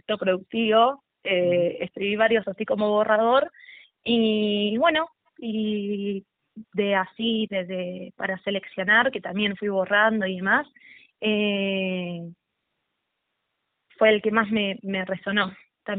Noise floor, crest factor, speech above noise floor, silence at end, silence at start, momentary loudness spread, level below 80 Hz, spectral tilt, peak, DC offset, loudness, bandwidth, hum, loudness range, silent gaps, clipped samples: -79 dBFS; 20 dB; 56 dB; 0 s; 0.1 s; 12 LU; -66 dBFS; -2.5 dB/octave; -4 dBFS; under 0.1%; -24 LUFS; 4.5 kHz; none; 5 LU; none; under 0.1%